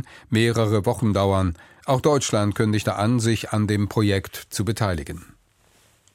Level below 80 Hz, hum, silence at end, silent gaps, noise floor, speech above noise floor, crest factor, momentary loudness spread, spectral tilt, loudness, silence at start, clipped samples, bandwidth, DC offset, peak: -46 dBFS; none; 0.9 s; none; -59 dBFS; 38 dB; 16 dB; 8 LU; -5.5 dB/octave; -22 LUFS; 0.1 s; under 0.1%; 16 kHz; under 0.1%; -6 dBFS